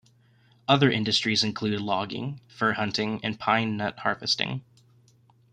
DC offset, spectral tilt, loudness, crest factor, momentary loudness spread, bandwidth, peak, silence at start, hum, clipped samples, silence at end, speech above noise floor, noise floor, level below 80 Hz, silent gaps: under 0.1%; -4.5 dB/octave; -26 LUFS; 24 dB; 11 LU; 11 kHz; -4 dBFS; 0.7 s; none; under 0.1%; 0.9 s; 34 dB; -60 dBFS; -64 dBFS; none